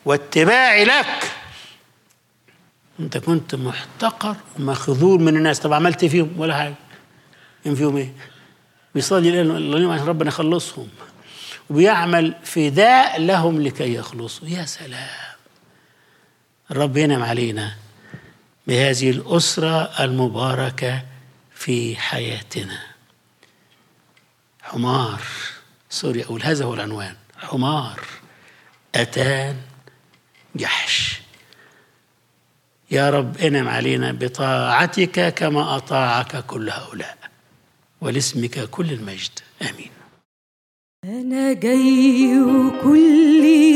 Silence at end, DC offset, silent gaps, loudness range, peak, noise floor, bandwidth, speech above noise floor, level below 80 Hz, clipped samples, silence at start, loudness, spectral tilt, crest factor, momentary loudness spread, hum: 0 s; under 0.1%; 40.25-41.03 s; 9 LU; -2 dBFS; -62 dBFS; 15.5 kHz; 44 dB; -66 dBFS; under 0.1%; 0.05 s; -18 LUFS; -5 dB/octave; 18 dB; 17 LU; none